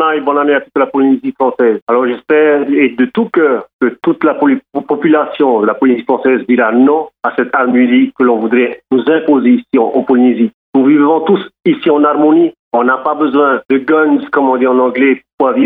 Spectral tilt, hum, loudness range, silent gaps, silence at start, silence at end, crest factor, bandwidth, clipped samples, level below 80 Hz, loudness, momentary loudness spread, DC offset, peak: -9.5 dB/octave; none; 1 LU; 1.82-1.87 s, 3.73-3.79 s, 10.54-10.73 s, 12.59-12.71 s, 15.33-15.38 s; 0 s; 0 s; 10 dB; 3.9 kHz; under 0.1%; -66 dBFS; -11 LUFS; 5 LU; under 0.1%; 0 dBFS